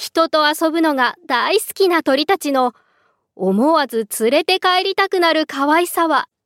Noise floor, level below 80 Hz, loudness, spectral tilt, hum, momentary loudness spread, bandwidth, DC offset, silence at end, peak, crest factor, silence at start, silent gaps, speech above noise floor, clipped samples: -62 dBFS; -72 dBFS; -16 LUFS; -3.5 dB/octave; none; 4 LU; 17 kHz; under 0.1%; 0.2 s; -2 dBFS; 16 dB; 0 s; none; 45 dB; under 0.1%